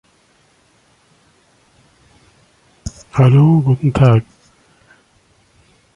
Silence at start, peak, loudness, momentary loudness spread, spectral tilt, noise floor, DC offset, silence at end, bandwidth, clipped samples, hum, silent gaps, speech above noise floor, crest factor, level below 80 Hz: 2.85 s; -2 dBFS; -13 LUFS; 23 LU; -8.5 dB/octave; -55 dBFS; under 0.1%; 1.75 s; 9.6 kHz; under 0.1%; none; none; 44 dB; 16 dB; -42 dBFS